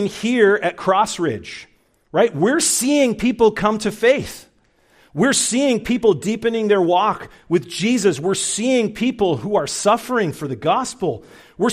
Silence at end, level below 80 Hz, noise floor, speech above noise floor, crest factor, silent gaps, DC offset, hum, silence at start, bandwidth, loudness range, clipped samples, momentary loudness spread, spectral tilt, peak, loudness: 0 s; -52 dBFS; -57 dBFS; 39 dB; 16 dB; none; under 0.1%; none; 0 s; 15.5 kHz; 1 LU; under 0.1%; 8 LU; -4 dB/octave; -2 dBFS; -18 LUFS